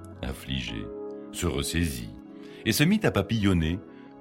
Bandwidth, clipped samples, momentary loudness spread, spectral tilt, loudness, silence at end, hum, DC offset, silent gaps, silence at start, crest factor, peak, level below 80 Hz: 16 kHz; under 0.1%; 16 LU; -5 dB/octave; -28 LUFS; 0 s; none; under 0.1%; none; 0 s; 20 dB; -8 dBFS; -42 dBFS